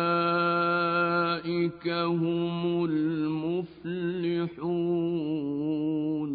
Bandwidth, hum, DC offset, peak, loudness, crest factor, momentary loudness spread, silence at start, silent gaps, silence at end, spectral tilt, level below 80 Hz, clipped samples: 4.8 kHz; none; under 0.1%; -14 dBFS; -28 LUFS; 14 dB; 6 LU; 0 s; none; 0 s; -11 dB/octave; -66 dBFS; under 0.1%